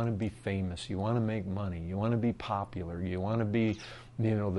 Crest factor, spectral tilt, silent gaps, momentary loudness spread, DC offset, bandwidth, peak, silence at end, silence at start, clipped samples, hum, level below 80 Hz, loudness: 14 dB; -8 dB/octave; none; 6 LU; under 0.1%; 10.5 kHz; -18 dBFS; 0 s; 0 s; under 0.1%; none; -56 dBFS; -33 LUFS